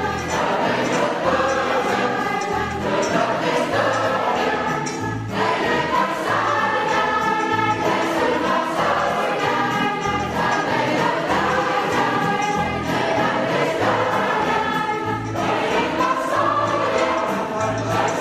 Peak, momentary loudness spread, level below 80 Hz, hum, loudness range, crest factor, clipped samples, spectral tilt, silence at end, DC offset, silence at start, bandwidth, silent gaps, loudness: -6 dBFS; 3 LU; -48 dBFS; none; 1 LU; 16 dB; under 0.1%; -4.5 dB/octave; 0 s; under 0.1%; 0 s; 15.5 kHz; none; -20 LUFS